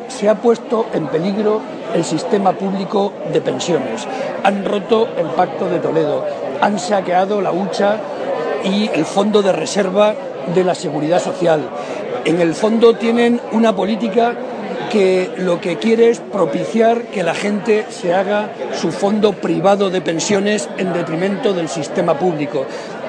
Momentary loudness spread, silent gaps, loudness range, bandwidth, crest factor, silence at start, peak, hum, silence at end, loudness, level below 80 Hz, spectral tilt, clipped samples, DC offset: 7 LU; none; 2 LU; 10 kHz; 16 dB; 0 s; 0 dBFS; none; 0 s; -17 LUFS; -64 dBFS; -5.5 dB/octave; under 0.1%; under 0.1%